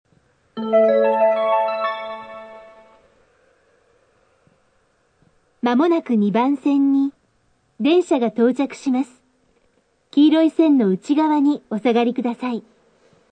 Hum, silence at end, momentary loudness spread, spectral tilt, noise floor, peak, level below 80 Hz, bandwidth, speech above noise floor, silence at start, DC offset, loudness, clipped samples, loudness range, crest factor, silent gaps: none; 0.7 s; 14 LU; -7 dB/octave; -63 dBFS; -4 dBFS; -72 dBFS; 9.2 kHz; 46 dB; 0.55 s; under 0.1%; -19 LUFS; under 0.1%; 8 LU; 16 dB; none